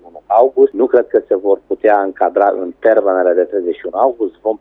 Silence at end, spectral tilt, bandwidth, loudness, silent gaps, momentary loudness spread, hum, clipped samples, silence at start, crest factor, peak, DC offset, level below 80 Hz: 0.05 s; -7.5 dB/octave; 3.9 kHz; -14 LUFS; none; 6 LU; none; under 0.1%; 0.05 s; 14 dB; 0 dBFS; under 0.1%; -58 dBFS